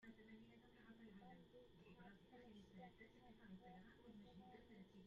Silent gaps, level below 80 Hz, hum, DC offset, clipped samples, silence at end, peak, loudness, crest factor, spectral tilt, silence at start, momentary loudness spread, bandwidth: none; -80 dBFS; none; under 0.1%; under 0.1%; 0 s; -50 dBFS; -66 LUFS; 14 dB; -5 dB/octave; 0 s; 4 LU; 7.2 kHz